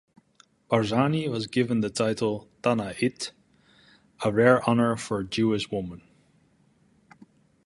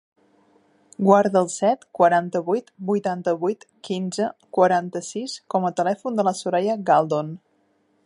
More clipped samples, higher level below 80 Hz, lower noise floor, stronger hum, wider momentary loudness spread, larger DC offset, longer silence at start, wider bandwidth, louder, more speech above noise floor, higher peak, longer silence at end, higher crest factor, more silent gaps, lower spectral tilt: neither; first, -60 dBFS vs -74 dBFS; about the same, -63 dBFS vs -65 dBFS; neither; about the same, 10 LU vs 12 LU; neither; second, 0.7 s vs 1 s; about the same, 11.5 kHz vs 11.5 kHz; second, -26 LUFS vs -22 LUFS; second, 38 dB vs 44 dB; about the same, -4 dBFS vs -2 dBFS; first, 1.7 s vs 0.7 s; about the same, 22 dB vs 20 dB; neither; about the same, -6 dB/octave vs -5.5 dB/octave